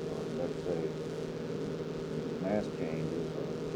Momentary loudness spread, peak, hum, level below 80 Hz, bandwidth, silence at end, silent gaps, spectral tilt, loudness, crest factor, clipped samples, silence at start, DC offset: 4 LU; -20 dBFS; none; -60 dBFS; 15.5 kHz; 0 s; none; -7 dB/octave; -36 LUFS; 16 dB; under 0.1%; 0 s; under 0.1%